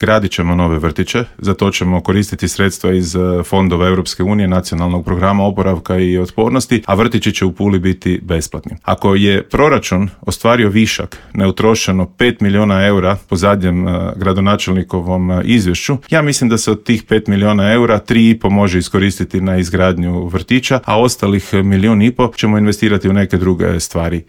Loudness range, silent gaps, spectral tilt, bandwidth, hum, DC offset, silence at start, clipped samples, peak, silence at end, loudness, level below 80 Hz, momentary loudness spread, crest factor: 2 LU; none; -5.5 dB/octave; 16.5 kHz; none; under 0.1%; 0 s; under 0.1%; 0 dBFS; 0.05 s; -13 LUFS; -34 dBFS; 6 LU; 12 dB